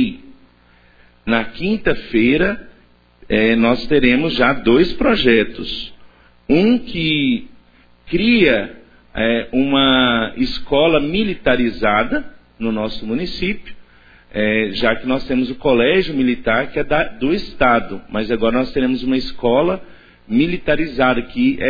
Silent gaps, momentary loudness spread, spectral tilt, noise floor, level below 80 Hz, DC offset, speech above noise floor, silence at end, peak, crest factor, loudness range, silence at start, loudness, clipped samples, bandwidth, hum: none; 9 LU; -7.5 dB/octave; -51 dBFS; -36 dBFS; under 0.1%; 35 dB; 0 s; 0 dBFS; 16 dB; 5 LU; 0 s; -17 LUFS; under 0.1%; 5 kHz; none